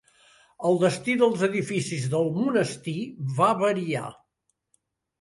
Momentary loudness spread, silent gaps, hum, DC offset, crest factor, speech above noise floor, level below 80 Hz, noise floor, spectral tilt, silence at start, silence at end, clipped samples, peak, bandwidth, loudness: 10 LU; none; none; under 0.1%; 18 dB; 52 dB; -68 dBFS; -77 dBFS; -6 dB/octave; 0.6 s; 1.1 s; under 0.1%; -8 dBFS; 11.5 kHz; -25 LUFS